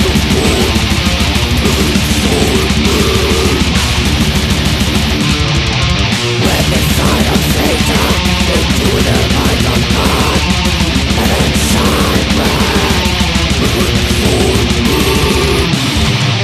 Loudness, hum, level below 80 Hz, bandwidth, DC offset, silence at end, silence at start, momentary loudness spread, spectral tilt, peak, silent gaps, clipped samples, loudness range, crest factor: -11 LUFS; none; -18 dBFS; 14.5 kHz; under 0.1%; 0 s; 0 s; 1 LU; -4.5 dB/octave; 0 dBFS; none; under 0.1%; 0 LU; 10 dB